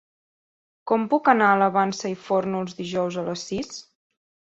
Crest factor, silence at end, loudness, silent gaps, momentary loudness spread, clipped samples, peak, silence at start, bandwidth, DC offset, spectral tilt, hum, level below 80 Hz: 22 dB; 0.7 s; -23 LUFS; none; 13 LU; under 0.1%; -2 dBFS; 0.85 s; 8 kHz; under 0.1%; -5 dB/octave; none; -64 dBFS